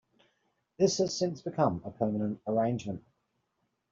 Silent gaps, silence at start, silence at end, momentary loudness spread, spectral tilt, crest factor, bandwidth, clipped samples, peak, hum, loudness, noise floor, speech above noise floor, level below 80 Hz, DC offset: none; 0.8 s; 0.9 s; 8 LU; -6.5 dB/octave; 20 dB; 7.8 kHz; under 0.1%; -12 dBFS; none; -31 LUFS; -79 dBFS; 49 dB; -66 dBFS; under 0.1%